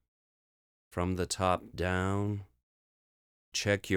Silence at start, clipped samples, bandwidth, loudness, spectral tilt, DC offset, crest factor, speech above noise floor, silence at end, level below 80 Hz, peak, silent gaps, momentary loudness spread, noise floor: 0.9 s; under 0.1%; 18.5 kHz; -33 LUFS; -4.5 dB/octave; under 0.1%; 20 dB; over 59 dB; 0 s; -60 dBFS; -14 dBFS; 2.63-3.52 s; 7 LU; under -90 dBFS